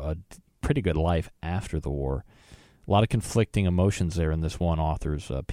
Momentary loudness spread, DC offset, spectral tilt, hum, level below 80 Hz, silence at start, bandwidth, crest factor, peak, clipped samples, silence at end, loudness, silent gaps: 9 LU; under 0.1%; -6.5 dB/octave; none; -36 dBFS; 0 s; 14 kHz; 18 dB; -10 dBFS; under 0.1%; 0 s; -27 LUFS; none